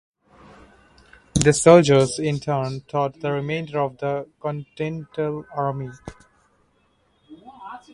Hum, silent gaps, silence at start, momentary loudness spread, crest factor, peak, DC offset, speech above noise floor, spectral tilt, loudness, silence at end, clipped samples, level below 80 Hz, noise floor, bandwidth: none; none; 1.35 s; 21 LU; 22 dB; 0 dBFS; under 0.1%; 43 dB; -5.5 dB/octave; -21 LUFS; 0.15 s; under 0.1%; -48 dBFS; -64 dBFS; 11.5 kHz